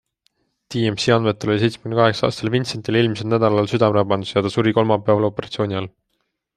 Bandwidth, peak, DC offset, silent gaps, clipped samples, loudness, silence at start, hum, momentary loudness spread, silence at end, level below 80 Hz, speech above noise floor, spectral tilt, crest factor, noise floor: 11 kHz; -2 dBFS; under 0.1%; none; under 0.1%; -19 LUFS; 0.7 s; none; 6 LU; 0.7 s; -56 dBFS; 54 dB; -6.5 dB/octave; 18 dB; -73 dBFS